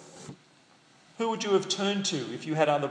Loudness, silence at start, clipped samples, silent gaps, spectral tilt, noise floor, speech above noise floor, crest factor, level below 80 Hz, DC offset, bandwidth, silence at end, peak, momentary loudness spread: -28 LUFS; 0 s; under 0.1%; none; -4 dB/octave; -60 dBFS; 32 dB; 20 dB; -82 dBFS; under 0.1%; 10.5 kHz; 0 s; -10 dBFS; 20 LU